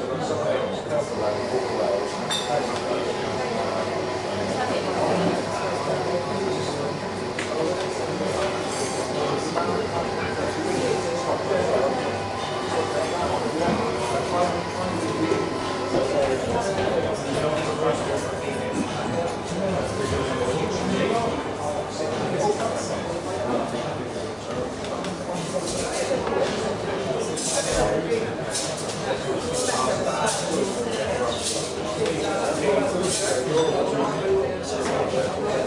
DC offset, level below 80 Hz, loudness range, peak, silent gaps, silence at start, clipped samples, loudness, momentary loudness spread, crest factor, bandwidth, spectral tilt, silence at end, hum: under 0.1%; -50 dBFS; 3 LU; -8 dBFS; none; 0 s; under 0.1%; -25 LUFS; 5 LU; 16 dB; 11.5 kHz; -4 dB/octave; 0 s; none